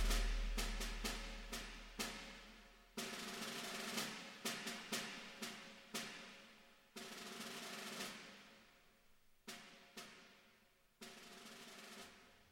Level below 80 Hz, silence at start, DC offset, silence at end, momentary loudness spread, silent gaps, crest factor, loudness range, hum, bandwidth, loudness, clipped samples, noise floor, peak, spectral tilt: -52 dBFS; 0 s; under 0.1%; 0 s; 16 LU; none; 22 dB; 11 LU; none; 16.5 kHz; -48 LUFS; under 0.1%; -73 dBFS; -26 dBFS; -2.5 dB/octave